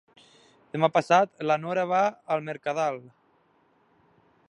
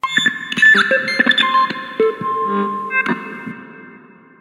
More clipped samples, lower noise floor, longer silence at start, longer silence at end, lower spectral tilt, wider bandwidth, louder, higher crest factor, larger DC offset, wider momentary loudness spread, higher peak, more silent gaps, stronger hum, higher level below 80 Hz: neither; first, -65 dBFS vs -43 dBFS; first, 0.75 s vs 0.05 s; first, 1.5 s vs 0.45 s; first, -5.5 dB/octave vs -3 dB/octave; second, 10.5 kHz vs 15.5 kHz; second, -26 LUFS vs -15 LUFS; first, 22 dB vs 16 dB; neither; second, 9 LU vs 17 LU; second, -6 dBFS vs 0 dBFS; neither; neither; second, -76 dBFS vs -68 dBFS